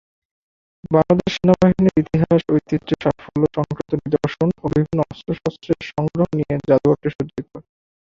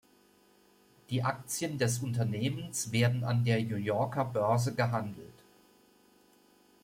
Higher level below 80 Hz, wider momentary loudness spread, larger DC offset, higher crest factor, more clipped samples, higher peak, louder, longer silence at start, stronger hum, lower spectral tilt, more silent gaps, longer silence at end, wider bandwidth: first, -44 dBFS vs -66 dBFS; first, 10 LU vs 6 LU; neither; about the same, 18 dB vs 18 dB; neither; first, -2 dBFS vs -14 dBFS; first, -19 LUFS vs -32 LUFS; second, 0.9 s vs 1.1 s; neither; first, -8.5 dB/octave vs -5.5 dB/octave; first, 7.15-7.19 s vs none; second, 0.6 s vs 1.5 s; second, 7.4 kHz vs 16 kHz